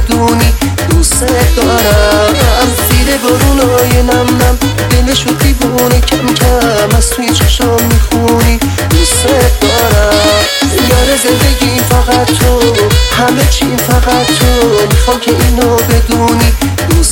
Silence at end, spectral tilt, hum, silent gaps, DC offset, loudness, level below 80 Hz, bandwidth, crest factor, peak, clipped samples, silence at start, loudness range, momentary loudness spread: 0 s; -4.5 dB/octave; none; none; under 0.1%; -8 LUFS; -14 dBFS; 17.5 kHz; 8 dB; 0 dBFS; under 0.1%; 0 s; 1 LU; 2 LU